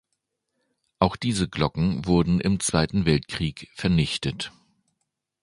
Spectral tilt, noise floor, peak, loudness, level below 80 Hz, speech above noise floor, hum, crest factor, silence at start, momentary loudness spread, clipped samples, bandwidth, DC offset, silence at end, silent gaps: -5.5 dB/octave; -79 dBFS; -2 dBFS; -24 LUFS; -42 dBFS; 55 dB; none; 24 dB; 1 s; 8 LU; under 0.1%; 11.5 kHz; under 0.1%; 0.95 s; none